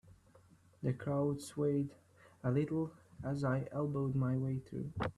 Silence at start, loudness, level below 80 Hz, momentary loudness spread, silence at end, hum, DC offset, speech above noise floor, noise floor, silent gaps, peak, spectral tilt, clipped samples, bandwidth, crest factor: 0.05 s; -38 LUFS; -64 dBFS; 7 LU; 0.05 s; none; under 0.1%; 29 dB; -65 dBFS; none; -22 dBFS; -8 dB/octave; under 0.1%; 12.5 kHz; 16 dB